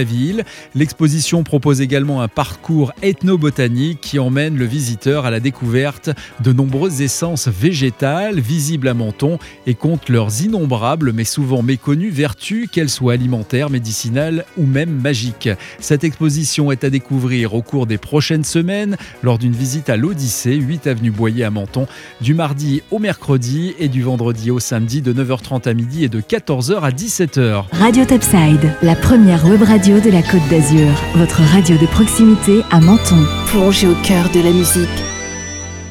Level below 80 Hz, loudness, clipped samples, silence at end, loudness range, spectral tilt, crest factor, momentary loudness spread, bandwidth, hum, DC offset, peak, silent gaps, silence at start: -36 dBFS; -14 LUFS; under 0.1%; 0 s; 7 LU; -5.5 dB/octave; 14 dB; 9 LU; 17 kHz; none; under 0.1%; 0 dBFS; none; 0 s